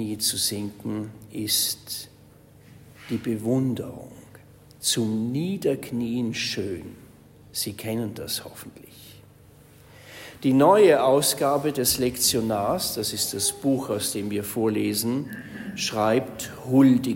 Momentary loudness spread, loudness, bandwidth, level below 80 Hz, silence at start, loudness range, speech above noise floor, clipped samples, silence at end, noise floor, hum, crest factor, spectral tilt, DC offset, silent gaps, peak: 17 LU; -24 LUFS; 16.5 kHz; -58 dBFS; 0 s; 10 LU; 27 dB; under 0.1%; 0 s; -51 dBFS; none; 20 dB; -4 dB/octave; under 0.1%; none; -4 dBFS